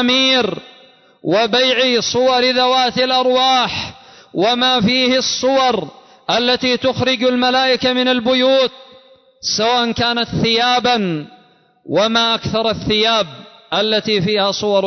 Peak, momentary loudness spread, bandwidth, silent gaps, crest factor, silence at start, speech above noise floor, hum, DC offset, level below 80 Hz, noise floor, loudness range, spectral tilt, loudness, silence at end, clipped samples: -4 dBFS; 9 LU; 6.4 kHz; none; 12 dB; 0 s; 36 dB; none; under 0.1%; -48 dBFS; -51 dBFS; 3 LU; -3.5 dB/octave; -15 LUFS; 0 s; under 0.1%